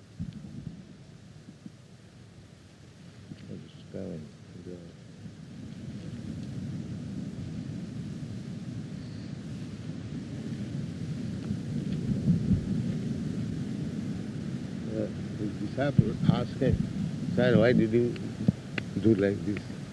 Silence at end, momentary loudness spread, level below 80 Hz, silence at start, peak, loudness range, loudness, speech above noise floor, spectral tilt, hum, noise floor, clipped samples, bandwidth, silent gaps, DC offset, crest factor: 0 s; 22 LU; -52 dBFS; 0 s; -8 dBFS; 18 LU; -31 LUFS; 26 dB; -8 dB/octave; none; -52 dBFS; under 0.1%; 11.5 kHz; none; under 0.1%; 24 dB